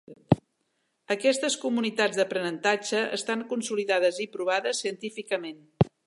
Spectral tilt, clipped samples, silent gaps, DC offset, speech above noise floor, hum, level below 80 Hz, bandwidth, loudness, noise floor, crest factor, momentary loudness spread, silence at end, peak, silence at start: -4.5 dB/octave; under 0.1%; none; under 0.1%; 48 dB; none; -58 dBFS; 11.5 kHz; -27 LUFS; -75 dBFS; 24 dB; 7 LU; 0.2 s; -4 dBFS; 0.1 s